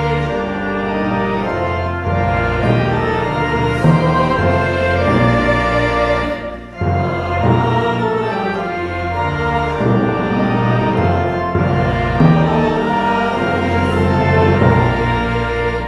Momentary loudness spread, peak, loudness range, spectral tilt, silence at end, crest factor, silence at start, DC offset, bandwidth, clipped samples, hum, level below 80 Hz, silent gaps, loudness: 6 LU; 0 dBFS; 3 LU; -8 dB/octave; 0 s; 16 dB; 0 s; under 0.1%; 11 kHz; under 0.1%; none; -30 dBFS; none; -16 LUFS